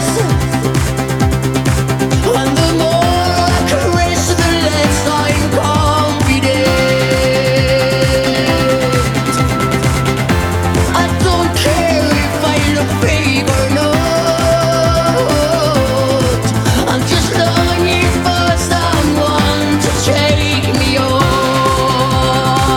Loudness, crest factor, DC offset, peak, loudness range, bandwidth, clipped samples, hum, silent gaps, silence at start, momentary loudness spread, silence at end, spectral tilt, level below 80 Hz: -12 LUFS; 12 dB; under 0.1%; 0 dBFS; 1 LU; 19 kHz; under 0.1%; none; none; 0 s; 2 LU; 0 s; -5 dB/octave; -24 dBFS